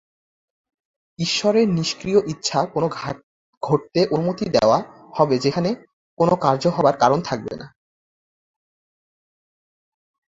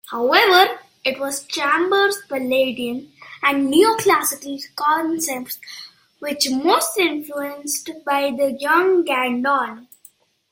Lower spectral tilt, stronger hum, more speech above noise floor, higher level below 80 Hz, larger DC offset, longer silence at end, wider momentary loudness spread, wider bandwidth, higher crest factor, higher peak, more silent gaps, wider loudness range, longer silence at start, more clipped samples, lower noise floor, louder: first, -5.5 dB/octave vs -1.5 dB/octave; neither; first, over 70 dB vs 33 dB; first, -58 dBFS vs -66 dBFS; neither; first, 2.6 s vs 0.7 s; about the same, 13 LU vs 14 LU; second, 8 kHz vs 16.5 kHz; about the same, 20 dB vs 20 dB; about the same, -2 dBFS vs 0 dBFS; first, 3.23-3.61 s, 5.93-6.17 s vs none; about the same, 4 LU vs 3 LU; first, 1.2 s vs 0.05 s; neither; first, under -90 dBFS vs -52 dBFS; about the same, -20 LUFS vs -19 LUFS